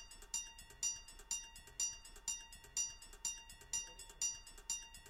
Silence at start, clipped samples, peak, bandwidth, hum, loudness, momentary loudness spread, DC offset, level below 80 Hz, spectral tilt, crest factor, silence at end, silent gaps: 0 s; under 0.1%; -26 dBFS; 16.5 kHz; none; -43 LUFS; 8 LU; under 0.1%; -62 dBFS; 1.5 dB/octave; 20 dB; 0 s; none